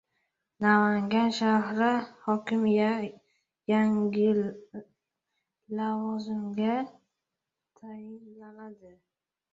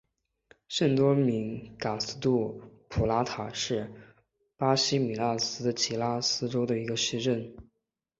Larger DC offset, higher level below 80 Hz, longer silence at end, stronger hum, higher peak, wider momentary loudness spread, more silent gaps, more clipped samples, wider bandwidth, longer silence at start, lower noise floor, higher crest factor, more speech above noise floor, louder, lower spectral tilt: neither; second, -72 dBFS vs -54 dBFS; about the same, 0.65 s vs 0.55 s; neither; about the same, -10 dBFS vs -10 dBFS; first, 22 LU vs 10 LU; neither; neither; about the same, 7.6 kHz vs 8 kHz; about the same, 0.6 s vs 0.7 s; first, -87 dBFS vs -82 dBFS; about the same, 20 dB vs 20 dB; first, 60 dB vs 54 dB; about the same, -27 LUFS vs -29 LUFS; first, -6.5 dB/octave vs -4.5 dB/octave